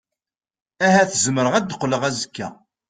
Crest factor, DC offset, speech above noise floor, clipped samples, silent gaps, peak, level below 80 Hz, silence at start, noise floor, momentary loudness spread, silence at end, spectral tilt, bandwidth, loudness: 18 dB; under 0.1%; 70 dB; under 0.1%; none; -4 dBFS; -60 dBFS; 0.8 s; -90 dBFS; 14 LU; 0.35 s; -4 dB/octave; 9.6 kHz; -19 LUFS